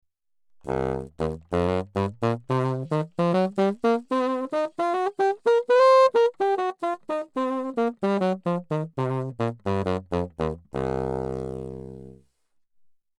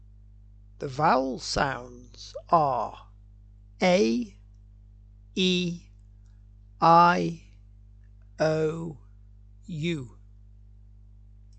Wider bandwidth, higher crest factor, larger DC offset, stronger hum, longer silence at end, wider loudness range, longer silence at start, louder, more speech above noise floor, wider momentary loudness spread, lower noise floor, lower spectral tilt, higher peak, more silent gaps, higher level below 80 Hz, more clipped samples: first, 11 kHz vs 9 kHz; second, 16 dB vs 22 dB; neither; second, none vs 50 Hz at -50 dBFS; second, 1.05 s vs 1.5 s; about the same, 8 LU vs 7 LU; second, 0.65 s vs 0.8 s; about the same, -25 LUFS vs -25 LUFS; first, 41 dB vs 26 dB; second, 11 LU vs 22 LU; first, -67 dBFS vs -51 dBFS; first, -7.5 dB/octave vs -5.5 dB/octave; about the same, -8 dBFS vs -6 dBFS; neither; about the same, -50 dBFS vs -50 dBFS; neither